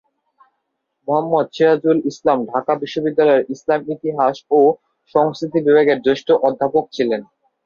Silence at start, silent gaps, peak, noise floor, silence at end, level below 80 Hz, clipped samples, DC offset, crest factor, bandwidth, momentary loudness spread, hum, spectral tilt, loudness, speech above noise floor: 1.1 s; none; -2 dBFS; -73 dBFS; 0.4 s; -62 dBFS; under 0.1%; under 0.1%; 16 dB; 7.2 kHz; 7 LU; none; -6.5 dB/octave; -17 LUFS; 57 dB